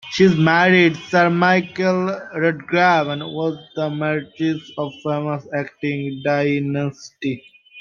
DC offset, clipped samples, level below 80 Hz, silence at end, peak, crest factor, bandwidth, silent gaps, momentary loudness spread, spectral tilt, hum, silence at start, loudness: under 0.1%; under 0.1%; -60 dBFS; 0 s; -2 dBFS; 18 dB; 7.4 kHz; none; 12 LU; -6.5 dB/octave; none; 0.05 s; -19 LUFS